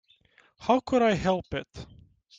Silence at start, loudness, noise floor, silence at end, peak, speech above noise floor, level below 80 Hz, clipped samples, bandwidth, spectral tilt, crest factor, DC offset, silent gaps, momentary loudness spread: 0.6 s; -26 LUFS; -62 dBFS; 0.55 s; -10 dBFS; 36 dB; -52 dBFS; under 0.1%; 7.8 kHz; -6 dB/octave; 18 dB; under 0.1%; none; 18 LU